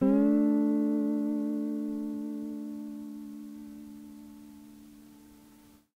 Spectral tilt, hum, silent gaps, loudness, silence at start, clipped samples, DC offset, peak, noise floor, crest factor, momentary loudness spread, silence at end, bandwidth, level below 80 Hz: -9 dB/octave; none; none; -30 LUFS; 0 s; under 0.1%; under 0.1%; -16 dBFS; -57 dBFS; 16 dB; 25 LU; 0.65 s; 15.5 kHz; -68 dBFS